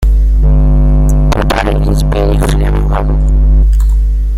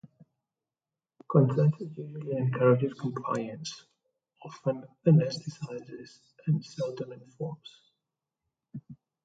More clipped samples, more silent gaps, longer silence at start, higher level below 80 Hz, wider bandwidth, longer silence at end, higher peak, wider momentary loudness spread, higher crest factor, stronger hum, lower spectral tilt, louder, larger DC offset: neither; neither; second, 0 s vs 1.3 s; first, -8 dBFS vs -74 dBFS; first, 11.5 kHz vs 7.8 kHz; second, 0 s vs 0.3 s; first, 0 dBFS vs -10 dBFS; second, 3 LU vs 23 LU; second, 8 dB vs 22 dB; first, 50 Hz at -10 dBFS vs none; about the same, -7 dB/octave vs -8 dB/octave; first, -12 LUFS vs -29 LUFS; neither